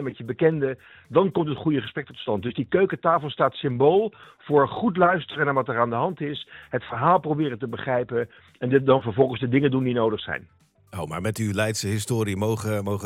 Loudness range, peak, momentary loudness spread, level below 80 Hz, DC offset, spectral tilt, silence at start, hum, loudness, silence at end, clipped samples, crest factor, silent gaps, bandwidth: 3 LU; -6 dBFS; 11 LU; -60 dBFS; under 0.1%; -6 dB/octave; 0 s; none; -24 LUFS; 0 s; under 0.1%; 18 dB; none; 16 kHz